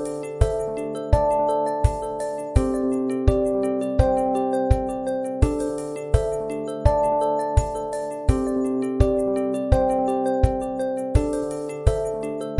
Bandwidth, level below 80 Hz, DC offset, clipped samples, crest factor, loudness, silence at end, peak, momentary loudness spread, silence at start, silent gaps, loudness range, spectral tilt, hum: 11.5 kHz; -28 dBFS; under 0.1%; under 0.1%; 20 dB; -23 LUFS; 0 s; -2 dBFS; 7 LU; 0 s; none; 1 LU; -8 dB/octave; none